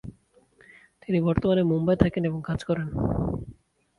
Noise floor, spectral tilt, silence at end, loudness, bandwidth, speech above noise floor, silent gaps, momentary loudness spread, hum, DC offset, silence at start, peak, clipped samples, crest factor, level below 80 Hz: -60 dBFS; -9 dB/octave; 0.45 s; -25 LUFS; 10.5 kHz; 36 dB; none; 15 LU; none; under 0.1%; 0.05 s; -4 dBFS; under 0.1%; 24 dB; -42 dBFS